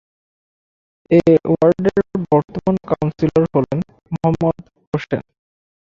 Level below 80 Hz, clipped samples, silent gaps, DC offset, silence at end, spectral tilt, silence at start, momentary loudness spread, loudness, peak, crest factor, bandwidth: -48 dBFS; under 0.1%; 4.87-4.92 s; under 0.1%; 0.7 s; -9.5 dB/octave; 1.1 s; 12 LU; -18 LUFS; -2 dBFS; 16 dB; 7.4 kHz